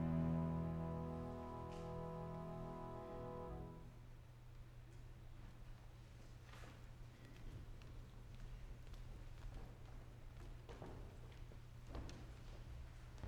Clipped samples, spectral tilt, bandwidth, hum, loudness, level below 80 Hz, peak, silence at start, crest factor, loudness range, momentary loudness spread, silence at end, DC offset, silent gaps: under 0.1%; -8 dB/octave; 13.5 kHz; none; -52 LUFS; -56 dBFS; -30 dBFS; 0 s; 20 dB; 11 LU; 15 LU; 0 s; under 0.1%; none